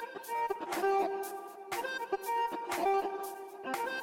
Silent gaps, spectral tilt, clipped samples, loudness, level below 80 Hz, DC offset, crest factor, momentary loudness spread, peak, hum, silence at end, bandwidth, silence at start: none; -2.5 dB/octave; under 0.1%; -35 LUFS; -74 dBFS; under 0.1%; 16 dB; 10 LU; -20 dBFS; none; 0 s; 17 kHz; 0 s